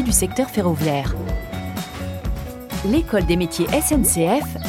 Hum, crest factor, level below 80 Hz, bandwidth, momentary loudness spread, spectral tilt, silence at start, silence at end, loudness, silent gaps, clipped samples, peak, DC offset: none; 18 dB; -30 dBFS; 18 kHz; 12 LU; -4.5 dB/octave; 0 s; 0 s; -21 LUFS; none; under 0.1%; -4 dBFS; under 0.1%